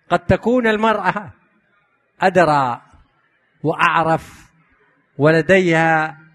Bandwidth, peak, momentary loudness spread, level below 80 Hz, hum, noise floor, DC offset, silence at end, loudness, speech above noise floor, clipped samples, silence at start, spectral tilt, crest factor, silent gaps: 12.5 kHz; 0 dBFS; 9 LU; -48 dBFS; none; -62 dBFS; under 0.1%; 0.2 s; -16 LUFS; 46 dB; under 0.1%; 0.1 s; -6.5 dB/octave; 18 dB; none